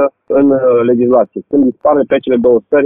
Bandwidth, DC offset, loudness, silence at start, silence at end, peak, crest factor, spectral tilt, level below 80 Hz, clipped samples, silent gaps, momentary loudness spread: 3.8 kHz; under 0.1%; -11 LUFS; 0 s; 0 s; 0 dBFS; 10 dB; -10.5 dB/octave; -50 dBFS; under 0.1%; none; 3 LU